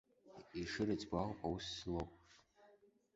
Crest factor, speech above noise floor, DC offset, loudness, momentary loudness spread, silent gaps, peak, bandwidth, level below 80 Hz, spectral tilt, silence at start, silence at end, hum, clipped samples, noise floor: 20 dB; 28 dB; under 0.1%; -44 LUFS; 12 LU; none; -24 dBFS; 7.6 kHz; -62 dBFS; -4.5 dB/octave; 0.25 s; 0.45 s; none; under 0.1%; -70 dBFS